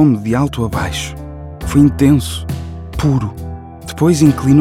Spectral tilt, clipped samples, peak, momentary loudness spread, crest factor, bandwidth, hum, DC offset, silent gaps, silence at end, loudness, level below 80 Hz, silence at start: -6.5 dB/octave; under 0.1%; 0 dBFS; 18 LU; 14 dB; 16 kHz; none; under 0.1%; none; 0 s; -15 LUFS; -32 dBFS; 0 s